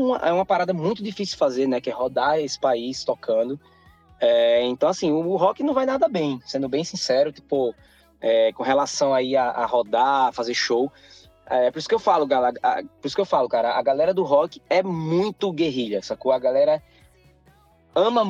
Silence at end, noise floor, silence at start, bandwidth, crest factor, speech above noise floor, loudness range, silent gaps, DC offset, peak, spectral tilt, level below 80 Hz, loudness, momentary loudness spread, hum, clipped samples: 0 s; -56 dBFS; 0 s; 9.2 kHz; 16 dB; 35 dB; 2 LU; none; under 0.1%; -6 dBFS; -5 dB/octave; -62 dBFS; -22 LUFS; 7 LU; none; under 0.1%